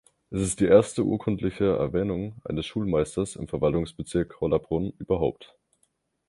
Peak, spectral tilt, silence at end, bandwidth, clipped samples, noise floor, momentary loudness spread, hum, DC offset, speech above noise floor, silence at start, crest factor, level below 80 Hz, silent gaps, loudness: -4 dBFS; -6.5 dB/octave; 0.85 s; 11.5 kHz; under 0.1%; -72 dBFS; 11 LU; none; under 0.1%; 46 dB; 0.3 s; 22 dB; -46 dBFS; none; -26 LUFS